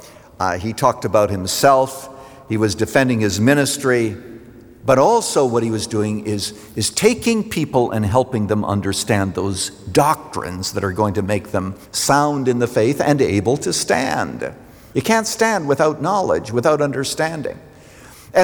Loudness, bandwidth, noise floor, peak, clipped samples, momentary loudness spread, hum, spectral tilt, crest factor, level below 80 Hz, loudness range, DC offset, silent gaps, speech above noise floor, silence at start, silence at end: -18 LUFS; over 20 kHz; -42 dBFS; -2 dBFS; under 0.1%; 9 LU; none; -4.5 dB/octave; 16 dB; -50 dBFS; 2 LU; under 0.1%; none; 24 dB; 0 s; 0 s